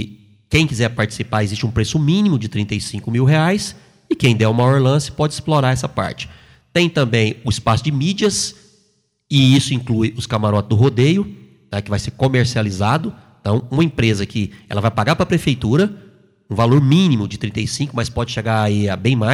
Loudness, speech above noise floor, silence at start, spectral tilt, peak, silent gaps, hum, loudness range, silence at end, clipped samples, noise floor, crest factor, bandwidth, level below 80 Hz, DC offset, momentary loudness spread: -17 LUFS; 46 dB; 0 s; -6 dB/octave; -2 dBFS; none; none; 2 LU; 0 s; under 0.1%; -62 dBFS; 16 dB; 13 kHz; -42 dBFS; under 0.1%; 9 LU